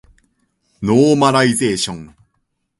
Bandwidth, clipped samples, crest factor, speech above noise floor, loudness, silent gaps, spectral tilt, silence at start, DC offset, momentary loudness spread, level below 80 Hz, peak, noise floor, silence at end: 11.5 kHz; under 0.1%; 16 dB; 55 dB; -15 LUFS; none; -5 dB/octave; 0.8 s; under 0.1%; 12 LU; -50 dBFS; 0 dBFS; -69 dBFS; 0.75 s